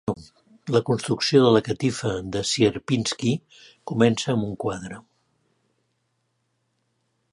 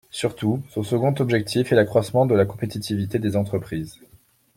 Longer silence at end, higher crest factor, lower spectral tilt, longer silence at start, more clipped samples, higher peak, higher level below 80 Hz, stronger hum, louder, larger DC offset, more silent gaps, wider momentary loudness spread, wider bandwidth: first, 2.35 s vs 0.65 s; about the same, 20 dB vs 18 dB; second, -5 dB/octave vs -6.5 dB/octave; about the same, 0.05 s vs 0.15 s; neither; about the same, -4 dBFS vs -4 dBFS; about the same, -56 dBFS vs -56 dBFS; neither; about the same, -23 LUFS vs -22 LUFS; neither; neither; first, 16 LU vs 9 LU; second, 11.5 kHz vs 16.5 kHz